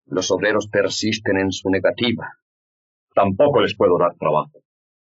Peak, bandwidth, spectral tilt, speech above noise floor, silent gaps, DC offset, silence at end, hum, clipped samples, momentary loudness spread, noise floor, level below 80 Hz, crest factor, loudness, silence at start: -4 dBFS; 7.8 kHz; -3.5 dB/octave; over 71 dB; 2.42-3.07 s; under 0.1%; 0.55 s; none; under 0.1%; 7 LU; under -90 dBFS; -64 dBFS; 16 dB; -19 LUFS; 0.1 s